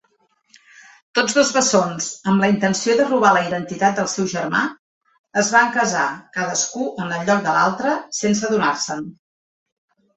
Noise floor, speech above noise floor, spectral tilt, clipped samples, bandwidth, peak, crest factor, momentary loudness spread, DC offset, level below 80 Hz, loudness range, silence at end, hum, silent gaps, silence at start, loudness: -63 dBFS; 45 dB; -3.5 dB/octave; under 0.1%; 8.2 kHz; -2 dBFS; 18 dB; 9 LU; under 0.1%; -62 dBFS; 3 LU; 1.05 s; none; 4.79-5.01 s, 5.19-5.24 s; 1.15 s; -19 LUFS